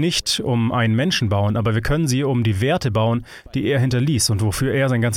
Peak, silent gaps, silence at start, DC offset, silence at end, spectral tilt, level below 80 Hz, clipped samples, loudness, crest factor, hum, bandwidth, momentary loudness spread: -8 dBFS; none; 0 s; under 0.1%; 0 s; -5 dB/octave; -38 dBFS; under 0.1%; -19 LUFS; 12 dB; none; 16 kHz; 3 LU